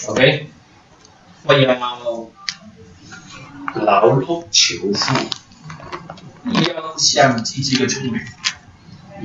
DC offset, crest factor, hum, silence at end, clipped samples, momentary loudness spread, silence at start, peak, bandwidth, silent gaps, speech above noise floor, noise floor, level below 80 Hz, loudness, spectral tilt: under 0.1%; 20 dB; none; 0 s; under 0.1%; 23 LU; 0 s; 0 dBFS; 8 kHz; none; 31 dB; -48 dBFS; -54 dBFS; -17 LUFS; -3.5 dB/octave